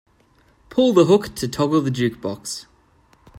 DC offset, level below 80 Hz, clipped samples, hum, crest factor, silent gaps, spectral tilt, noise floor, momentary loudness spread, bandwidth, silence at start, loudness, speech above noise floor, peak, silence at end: under 0.1%; -54 dBFS; under 0.1%; none; 18 dB; none; -6 dB/octave; -57 dBFS; 14 LU; 16 kHz; 0.7 s; -20 LUFS; 39 dB; -2 dBFS; 0 s